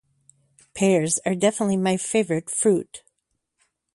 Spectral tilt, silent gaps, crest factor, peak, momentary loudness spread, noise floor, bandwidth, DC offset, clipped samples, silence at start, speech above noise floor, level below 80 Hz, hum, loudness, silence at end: -4.5 dB/octave; none; 18 dB; -6 dBFS; 12 LU; -76 dBFS; 11.5 kHz; under 0.1%; under 0.1%; 0.75 s; 55 dB; -64 dBFS; none; -22 LUFS; 0.95 s